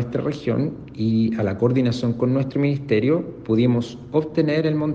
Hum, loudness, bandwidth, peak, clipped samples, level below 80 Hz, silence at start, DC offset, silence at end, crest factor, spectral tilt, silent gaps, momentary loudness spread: none; -21 LUFS; 7.8 kHz; -6 dBFS; under 0.1%; -54 dBFS; 0 s; under 0.1%; 0 s; 14 dB; -8.5 dB/octave; none; 5 LU